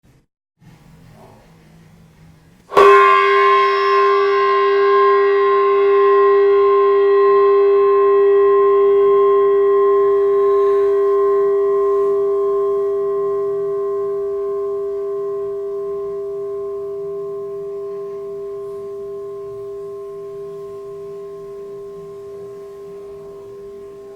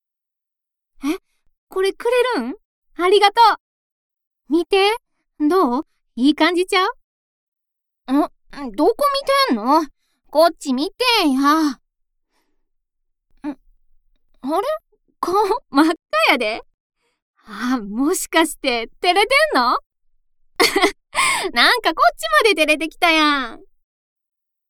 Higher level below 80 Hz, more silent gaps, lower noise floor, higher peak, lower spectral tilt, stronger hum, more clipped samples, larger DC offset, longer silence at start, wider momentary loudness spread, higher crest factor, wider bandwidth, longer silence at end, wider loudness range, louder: second, -58 dBFS vs -50 dBFS; second, none vs 1.58-1.67 s, 2.65-2.82 s, 3.60-4.10 s, 4.27-4.31 s, 7.04-7.52 s, 16.74-16.90 s, 17.22-17.34 s, 19.86-19.90 s; second, -47 dBFS vs -85 dBFS; about the same, 0 dBFS vs 0 dBFS; first, -5.5 dB/octave vs -2 dB/octave; neither; neither; neither; first, 2.7 s vs 1 s; first, 20 LU vs 15 LU; about the same, 16 dB vs 20 dB; second, 6.2 kHz vs 18.5 kHz; second, 0 s vs 1.1 s; first, 18 LU vs 6 LU; about the same, -15 LUFS vs -17 LUFS